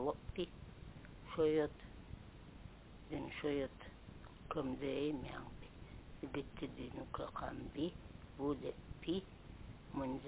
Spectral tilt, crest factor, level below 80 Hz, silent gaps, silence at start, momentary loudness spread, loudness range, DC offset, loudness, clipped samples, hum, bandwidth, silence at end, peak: -5.5 dB/octave; 18 dB; -58 dBFS; none; 0 s; 17 LU; 4 LU; under 0.1%; -43 LUFS; under 0.1%; none; 4 kHz; 0 s; -26 dBFS